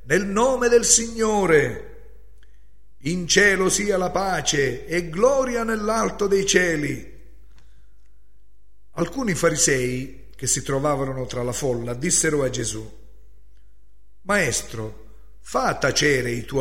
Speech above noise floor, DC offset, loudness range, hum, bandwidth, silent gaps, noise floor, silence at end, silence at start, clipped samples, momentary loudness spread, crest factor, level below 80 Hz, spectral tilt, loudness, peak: 36 dB; 1%; 5 LU; none; 16 kHz; none; -57 dBFS; 0 s; 0.05 s; under 0.1%; 12 LU; 20 dB; -44 dBFS; -3 dB/octave; -21 LUFS; -2 dBFS